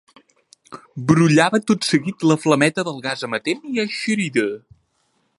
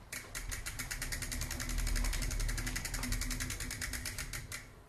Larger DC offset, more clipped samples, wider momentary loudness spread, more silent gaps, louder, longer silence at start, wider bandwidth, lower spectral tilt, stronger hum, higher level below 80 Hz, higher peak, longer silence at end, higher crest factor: neither; neither; first, 11 LU vs 5 LU; neither; first, -19 LUFS vs -39 LUFS; first, 0.7 s vs 0 s; second, 11.5 kHz vs 14 kHz; first, -5 dB/octave vs -2.5 dB/octave; neither; second, -60 dBFS vs -40 dBFS; first, 0 dBFS vs -22 dBFS; first, 0.8 s vs 0 s; about the same, 20 dB vs 16 dB